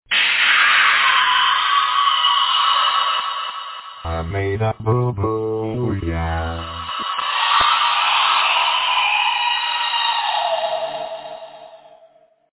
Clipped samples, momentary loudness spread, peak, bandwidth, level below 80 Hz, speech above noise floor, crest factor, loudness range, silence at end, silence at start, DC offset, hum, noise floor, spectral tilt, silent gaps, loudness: under 0.1%; 14 LU; -2 dBFS; 4 kHz; -38 dBFS; 31 dB; 16 dB; 8 LU; 0.85 s; 0.1 s; under 0.1%; none; -52 dBFS; -7.5 dB/octave; none; -17 LUFS